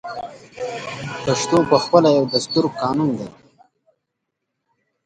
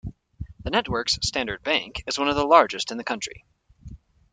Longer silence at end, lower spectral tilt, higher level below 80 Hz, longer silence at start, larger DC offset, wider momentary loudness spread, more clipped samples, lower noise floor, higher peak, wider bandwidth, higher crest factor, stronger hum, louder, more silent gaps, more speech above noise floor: first, 1.75 s vs 0.35 s; first, -5 dB/octave vs -3 dB/octave; second, -58 dBFS vs -46 dBFS; about the same, 0.05 s vs 0.05 s; neither; about the same, 17 LU vs 18 LU; neither; first, -78 dBFS vs -45 dBFS; about the same, 0 dBFS vs -2 dBFS; first, 11 kHz vs 9.6 kHz; about the same, 20 dB vs 24 dB; neither; first, -19 LUFS vs -23 LUFS; neither; first, 59 dB vs 21 dB